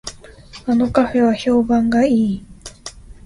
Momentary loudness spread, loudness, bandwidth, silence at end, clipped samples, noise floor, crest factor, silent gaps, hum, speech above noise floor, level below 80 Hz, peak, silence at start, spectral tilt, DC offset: 19 LU; -16 LUFS; 11.5 kHz; 0.15 s; under 0.1%; -40 dBFS; 16 dB; none; none; 25 dB; -42 dBFS; -2 dBFS; 0.05 s; -6 dB/octave; under 0.1%